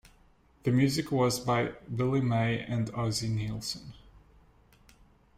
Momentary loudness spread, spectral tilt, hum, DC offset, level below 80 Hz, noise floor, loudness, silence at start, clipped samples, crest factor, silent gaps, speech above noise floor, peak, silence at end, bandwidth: 9 LU; -5.5 dB/octave; none; under 0.1%; -56 dBFS; -62 dBFS; -30 LUFS; 0.65 s; under 0.1%; 16 dB; none; 33 dB; -14 dBFS; 1.2 s; 16 kHz